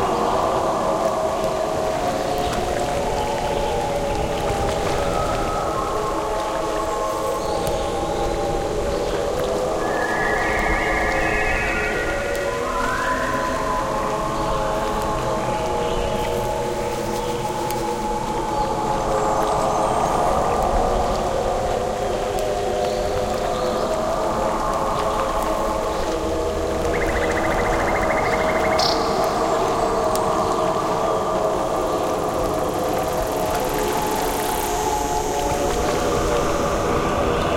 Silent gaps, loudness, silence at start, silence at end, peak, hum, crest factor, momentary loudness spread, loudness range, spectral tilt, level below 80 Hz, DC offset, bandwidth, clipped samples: none; -22 LUFS; 0 s; 0 s; -2 dBFS; none; 20 dB; 3 LU; 3 LU; -4.5 dB/octave; -34 dBFS; under 0.1%; 17 kHz; under 0.1%